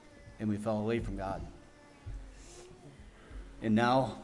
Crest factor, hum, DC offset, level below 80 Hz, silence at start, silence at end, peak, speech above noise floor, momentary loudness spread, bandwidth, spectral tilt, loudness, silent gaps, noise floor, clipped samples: 20 dB; none; under 0.1%; -50 dBFS; 0.05 s; 0 s; -16 dBFS; 25 dB; 25 LU; 11.5 kHz; -7 dB/octave; -33 LUFS; none; -56 dBFS; under 0.1%